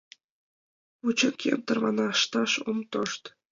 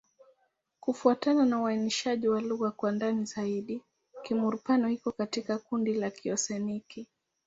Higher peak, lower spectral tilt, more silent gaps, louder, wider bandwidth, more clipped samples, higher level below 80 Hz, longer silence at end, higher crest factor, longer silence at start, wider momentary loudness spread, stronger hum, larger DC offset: about the same, -10 dBFS vs -10 dBFS; second, -3 dB/octave vs -4.5 dB/octave; neither; first, -27 LUFS vs -30 LUFS; about the same, 7.8 kHz vs 8 kHz; neither; about the same, -76 dBFS vs -74 dBFS; second, 0.25 s vs 0.45 s; about the same, 18 dB vs 20 dB; first, 1.05 s vs 0.85 s; second, 8 LU vs 11 LU; neither; neither